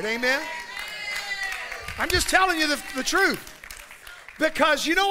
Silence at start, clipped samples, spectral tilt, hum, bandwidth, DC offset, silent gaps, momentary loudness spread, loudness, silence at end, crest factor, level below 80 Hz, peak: 0 s; under 0.1%; -2 dB/octave; none; 16 kHz; under 0.1%; none; 20 LU; -24 LUFS; 0 s; 20 dB; -44 dBFS; -6 dBFS